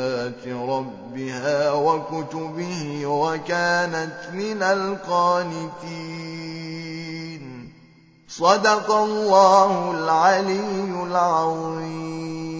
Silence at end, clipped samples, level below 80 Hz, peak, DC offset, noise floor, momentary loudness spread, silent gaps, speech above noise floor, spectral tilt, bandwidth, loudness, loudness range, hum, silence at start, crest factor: 0 s; under 0.1%; -66 dBFS; -2 dBFS; under 0.1%; -52 dBFS; 15 LU; none; 31 dB; -4.5 dB/octave; 8 kHz; -22 LUFS; 7 LU; none; 0 s; 20 dB